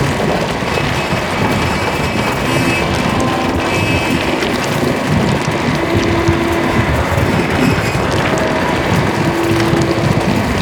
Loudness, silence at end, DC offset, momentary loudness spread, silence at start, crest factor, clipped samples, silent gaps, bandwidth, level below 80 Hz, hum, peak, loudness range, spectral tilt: -14 LUFS; 0 s; under 0.1%; 2 LU; 0 s; 14 dB; under 0.1%; none; over 20 kHz; -30 dBFS; none; 0 dBFS; 1 LU; -5.5 dB/octave